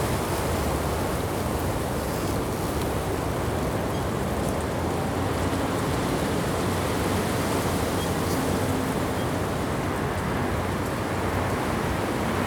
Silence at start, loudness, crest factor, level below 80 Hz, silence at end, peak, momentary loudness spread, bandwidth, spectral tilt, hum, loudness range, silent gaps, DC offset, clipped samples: 0 s; -26 LUFS; 14 dB; -38 dBFS; 0 s; -12 dBFS; 2 LU; over 20 kHz; -5.5 dB/octave; none; 2 LU; none; under 0.1%; under 0.1%